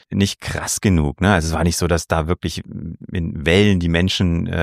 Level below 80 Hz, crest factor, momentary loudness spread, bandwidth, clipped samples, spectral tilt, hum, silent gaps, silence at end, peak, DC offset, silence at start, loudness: -32 dBFS; 16 dB; 11 LU; 15.5 kHz; under 0.1%; -5 dB/octave; none; none; 0 s; -2 dBFS; under 0.1%; 0.1 s; -18 LUFS